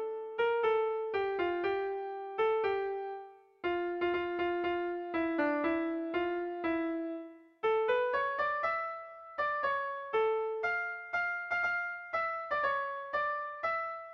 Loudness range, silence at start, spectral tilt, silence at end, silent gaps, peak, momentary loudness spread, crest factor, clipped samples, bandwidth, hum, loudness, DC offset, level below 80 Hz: 1 LU; 0 s; -6 dB/octave; 0 s; none; -20 dBFS; 7 LU; 14 dB; under 0.1%; 6.2 kHz; none; -33 LUFS; under 0.1%; -68 dBFS